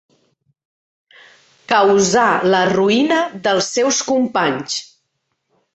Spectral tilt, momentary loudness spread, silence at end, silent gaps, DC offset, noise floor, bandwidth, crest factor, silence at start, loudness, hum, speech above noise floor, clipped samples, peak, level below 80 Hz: -3.5 dB/octave; 6 LU; 0.9 s; none; under 0.1%; -71 dBFS; 8.4 kHz; 16 dB; 1.7 s; -16 LUFS; none; 56 dB; under 0.1%; -2 dBFS; -58 dBFS